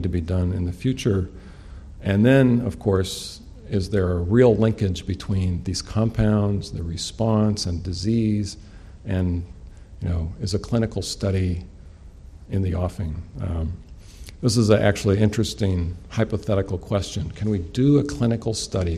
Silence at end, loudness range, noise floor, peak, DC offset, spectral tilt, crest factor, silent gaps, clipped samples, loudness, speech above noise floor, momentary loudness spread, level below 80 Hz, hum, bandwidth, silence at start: 0 s; 6 LU; -43 dBFS; -4 dBFS; under 0.1%; -6.5 dB/octave; 18 dB; none; under 0.1%; -23 LUFS; 21 dB; 14 LU; -38 dBFS; none; 13.5 kHz; 0 s